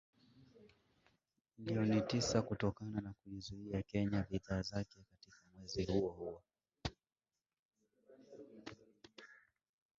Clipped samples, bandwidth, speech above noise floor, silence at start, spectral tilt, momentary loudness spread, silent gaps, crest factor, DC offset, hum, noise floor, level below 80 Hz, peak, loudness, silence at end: under 0.1%; 7.6 kHz; 37 dB; 0.4 s; -6 dB/octave; 23 LU; 7.59-7.69 s; 24 dB; under 0.1%; none; -77 dBFS; -62 dBFS; -20 dBFS; -41 LUFS; 0.65 s